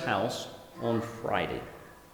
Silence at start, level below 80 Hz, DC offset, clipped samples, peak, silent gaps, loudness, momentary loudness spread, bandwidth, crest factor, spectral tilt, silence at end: 0 s; -58 dBFS; under 0.1%; under 0.1%; -14 dBFS; none; -33 LUFS; 14 LU; over 20 kHz; 20 dB; -5 dB/octave; 0 s